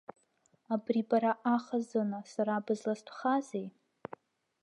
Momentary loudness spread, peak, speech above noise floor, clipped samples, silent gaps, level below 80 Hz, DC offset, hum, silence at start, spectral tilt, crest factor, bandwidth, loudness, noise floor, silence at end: 19 LU; -16 dBFS; 40 dB; under 0.1%; none; -86 dBFS; under 0.1%; none; 0.7 s; -6.5 dB/octave; 18 dB; 10.5 kHz; -33 LUFS; -72 dBFS; 0.9 s